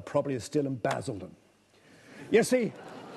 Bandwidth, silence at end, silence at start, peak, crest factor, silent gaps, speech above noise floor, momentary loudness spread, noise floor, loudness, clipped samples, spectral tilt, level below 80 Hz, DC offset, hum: 12.5 kHz; 0 s; 0 s; -10 dBFS; 20 dB; none; 33 dB; 20 LU; -61 dBFS; -29 LUFS; under 0.1%; -5.5 dB/octave; -70 dBFS; under 0.1%; none